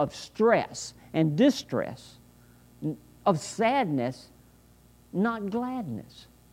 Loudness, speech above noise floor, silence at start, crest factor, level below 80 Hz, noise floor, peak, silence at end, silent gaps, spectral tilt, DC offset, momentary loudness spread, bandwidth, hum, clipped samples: -28 LUFS; 30 dB; 0 s; 20 dB; -62 dBFS; -57 dBFS; -10 dBFS; 0.3 s; none; -6 dB/octave; under 0.1%; 14 LU; 16 kHz; 60 Hz at -55 dBFS; under 0.1%